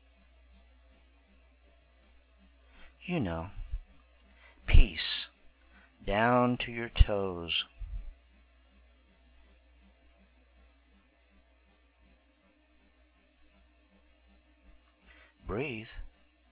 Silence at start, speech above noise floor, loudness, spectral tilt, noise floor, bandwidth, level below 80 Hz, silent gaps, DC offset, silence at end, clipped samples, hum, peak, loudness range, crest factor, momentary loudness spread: 2.85 s; 37 dB; -32 LUFS; -4 dB/octave; -67 dBFS; 4 kHz; -36 dBFS; none; under 0.1%; 0.45 s; under 0.1%; none; -6 dBFS; 14 LU; 26 dB; 20 LU